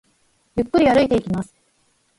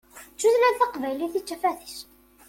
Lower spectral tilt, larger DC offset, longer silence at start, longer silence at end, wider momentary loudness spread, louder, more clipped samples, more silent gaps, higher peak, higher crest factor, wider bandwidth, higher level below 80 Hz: first, -7 dB/octave vs -2 dB/octave; neither; first, 0.55 s vs 0.15 s; first, 0.75 s vs 0.45 s; second, 13 LU vs 20 LU; first, -19 LUFS vs -24 LUFS; neither; neither; first, -4 dBFS vs -8 dBFS; about the same, 18 dB vs 18 dB; second, 11.5 kHz vs 17 kHz; first, -46 dBFS vs -64 dBFS